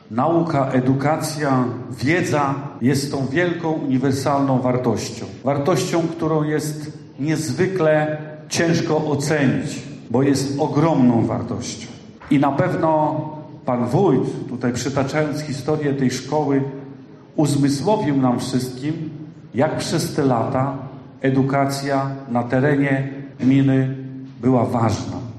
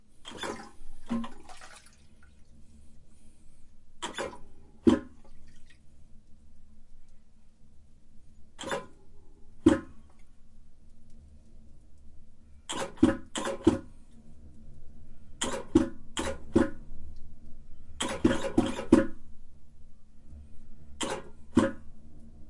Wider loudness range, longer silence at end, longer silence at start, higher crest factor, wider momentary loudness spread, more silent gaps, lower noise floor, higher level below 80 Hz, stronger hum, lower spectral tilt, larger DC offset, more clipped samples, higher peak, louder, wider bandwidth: second, 2 LU vs 14 LU; about the same, 0 s vs 0 s; about the same, 0.1 s vs 0 s; second, 14 dB vs 26 dB; second, 11 LU vs 27 LU; neither; second, -40 dBFS vs -52 dBFS; second, -56 dBFS vs -48 dBFS; neither; first, -6.5 dB/octave vs -5 dB/octave; neither; neither; about the same, -4 dBFS vs -6 dBFS; first, -20 LUFS vs -30 LUFS; first, 13 kHz vs 11.5 kHz